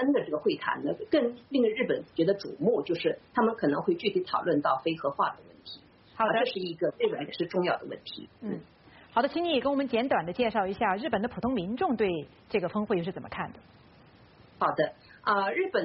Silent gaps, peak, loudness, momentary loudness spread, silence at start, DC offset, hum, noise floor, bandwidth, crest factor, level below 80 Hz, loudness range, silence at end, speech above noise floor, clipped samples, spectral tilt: none; -12 dBFS; -29 LUFS; 11 LU; 0 s; under 0.1%; none; -56 dBFS; 5.8 kHz; 16 dB; -64 dBFS; 4 LU; 0 s; 27 dB; under 0.1%; -4 dB/octave